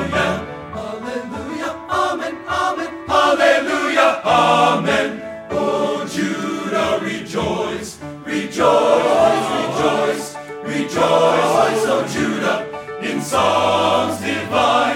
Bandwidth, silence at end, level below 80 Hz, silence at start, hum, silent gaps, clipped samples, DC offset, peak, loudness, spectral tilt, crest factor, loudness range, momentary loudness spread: 16.5 kHz; 0 s; -50 dBFS; 0 s; none; none; under 0.1%; under 0.1%; -2 dBFS; -18 LUFS; -4 dB/octave; 16 dB; 5 LU; 12 LU